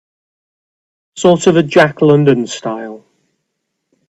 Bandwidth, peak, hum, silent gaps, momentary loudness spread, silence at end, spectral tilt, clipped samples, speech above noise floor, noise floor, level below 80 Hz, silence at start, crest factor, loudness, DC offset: 9.4 kHz; 0 dBFS; none; none; 13 LU; 1.1 s; -6 dB/octave; under 0.1%; 61 dB; -72 dBFS; -56 dBFS; 1.15 s; 14 dB; -12 LUFS; under 0.1%